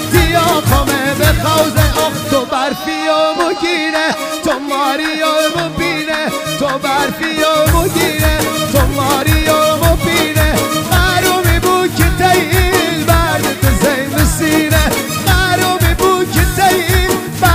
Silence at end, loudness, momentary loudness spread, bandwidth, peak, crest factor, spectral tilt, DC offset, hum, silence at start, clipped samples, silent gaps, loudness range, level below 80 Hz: 0 s; -13 LUFS; 5 LU; 16 kHz; 0 dBFS; 12 dB; -4.5 dB/octave; under 0.1%; none; 0 s; under 0.1%; none; 3 LU; -22 dBFS